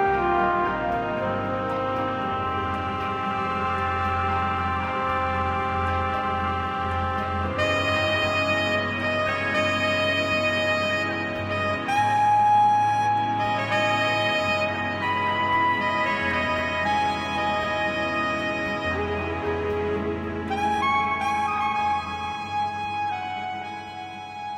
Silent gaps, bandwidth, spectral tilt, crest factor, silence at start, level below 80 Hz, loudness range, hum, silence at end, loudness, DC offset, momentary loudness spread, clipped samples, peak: none; 14.5 kHz; -5 dB/octave; 14 dB; 0 s; -46 dBFS; 4 LU; none; 0 s; -24 LUFS; under 0.1%; 6 LU; under 0.1%; -10 dBFS